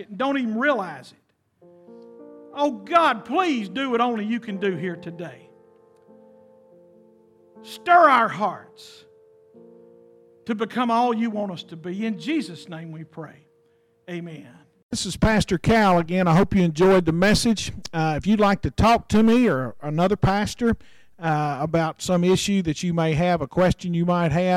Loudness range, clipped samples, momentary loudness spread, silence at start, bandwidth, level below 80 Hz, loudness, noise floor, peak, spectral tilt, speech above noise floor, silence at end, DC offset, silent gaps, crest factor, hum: 10 LU; under 0.1%; 18 LU; 0 s; 14.5 kHz; -44 dBFS; -21 LUFS; -62 dBFS; -2 dBFS; -6 dB/octave; 41 dB; 0 s; under 0.1%; 14.83-14.89 s; 20 dB; none